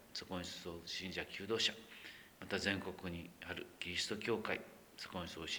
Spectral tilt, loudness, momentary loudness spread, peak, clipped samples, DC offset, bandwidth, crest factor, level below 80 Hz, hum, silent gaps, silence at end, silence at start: -3 dB/octave; -42 LUFS; 15 LU; -20 dBFS; under 0.1%; under 0.1%; over 20 kHz; 24 dB; -68 dBFS; none; none; 0 s; 0 s